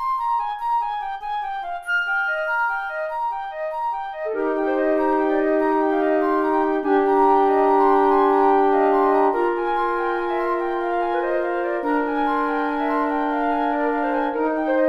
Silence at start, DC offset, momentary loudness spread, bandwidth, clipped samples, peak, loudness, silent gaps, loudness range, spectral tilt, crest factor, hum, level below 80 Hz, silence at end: 0 s; under 0.1%; 10 LU; 11 kHz; under 0.1%; -6 dBFS; -21 LUFS; none; 6 LU; -5.5 dB/octave; 14 dB; none; -50 dBFS; 0 s